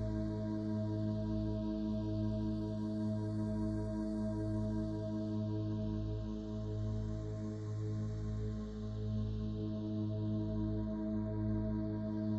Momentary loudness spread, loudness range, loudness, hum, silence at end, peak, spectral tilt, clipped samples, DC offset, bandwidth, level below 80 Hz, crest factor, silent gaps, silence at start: 4 LU; 2 LU; -39 LUFS; none; 0 s; -26 dBFS; -9.5 dB/octave; under 0.1%; under 0.1%; 7.6 kHz; -48 dBFS; 12 dB; none; 0 s